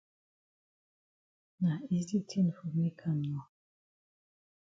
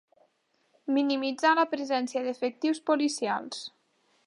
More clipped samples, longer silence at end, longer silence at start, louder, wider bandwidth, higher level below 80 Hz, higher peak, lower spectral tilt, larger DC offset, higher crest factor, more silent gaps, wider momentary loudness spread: neither; first, 1.25 s vs 0.6 s; first, 1.6 s vs 0.85 s; second, -34 LUFS vs -28 LUFS; second, 7.6 kHz vs 11.5 kHz; first, -74 dBFS vs -86 dBFS; second, -20 dBFS vs -10 dBFS; first, -8 dB/octave vs -3 dB/octave; neither; about the same, 16 dB vs 18 dB; neither; second, 4 LU vs 14 LU